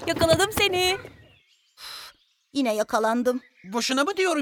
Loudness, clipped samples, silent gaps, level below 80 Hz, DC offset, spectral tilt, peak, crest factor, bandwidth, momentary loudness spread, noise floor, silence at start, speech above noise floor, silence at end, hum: -24 LUFS; under 0.1%; none; -52 dBFS; under 0.1%; -3.5 dB/octave; -6 dBFS; 20 dB; 19.5 kHz; 18 LU; -60 dBFS; 0 s; 37 dB; 0 s; none